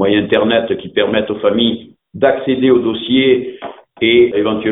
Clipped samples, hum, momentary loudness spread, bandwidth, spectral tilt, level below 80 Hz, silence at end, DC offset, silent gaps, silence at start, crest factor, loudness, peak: under 0.1%; none; 7 LU; 4 kHz; -9 dB/octave; -50 dBFS; 0 s; under 0.1%; none; 0 s; 14 dB; -14 LUFS; 0 dBFS